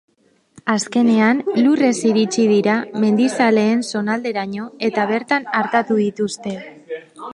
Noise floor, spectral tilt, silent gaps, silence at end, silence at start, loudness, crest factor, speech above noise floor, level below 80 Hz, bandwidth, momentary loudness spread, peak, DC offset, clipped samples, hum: -55 dBFS; -5 dB/octave; none; 0 s; 0.65 s; -18 LUFS; 16 dB; 38 dB; -66 dBFS; 11.5 kHz; 13 LU; -2 dBFS; under 0.1%; under 0.1%; none